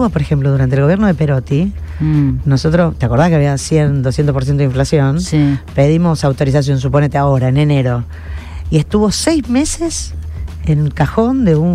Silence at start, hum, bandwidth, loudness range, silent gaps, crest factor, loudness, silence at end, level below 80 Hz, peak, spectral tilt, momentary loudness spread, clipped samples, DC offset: 0 s; none; 12 kHz; 2 LU; none; 12 dB; -14 LUFS; 0 s; -28 dBFS; 0 dBFS; -6.5 dB/octave; 8 LU; under 0.1%; under 0.1%